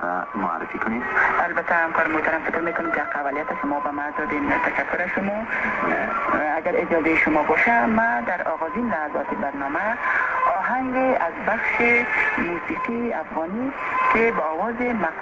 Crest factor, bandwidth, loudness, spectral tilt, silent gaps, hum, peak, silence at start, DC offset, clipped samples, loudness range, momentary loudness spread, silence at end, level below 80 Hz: 16 dB; 7.8 kHz; -22 LUFS; -6.5 dB/octave; none; none; -6 dBFS; 0 s; under 0.1%; under 0.1%; 3 LU; 8 LU; 0 s; -52 dBFS